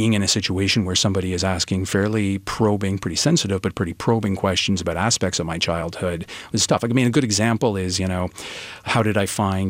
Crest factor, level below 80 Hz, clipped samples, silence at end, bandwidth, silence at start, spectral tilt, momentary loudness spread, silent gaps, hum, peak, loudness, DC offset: 16 dB; -46 dBFS; under 0.1%; 0 s; 16 kHz; 0 s; -4.5 dB/octave; 7 LU; none; none; -4 dBFS; -21 LUFS; under 0.1%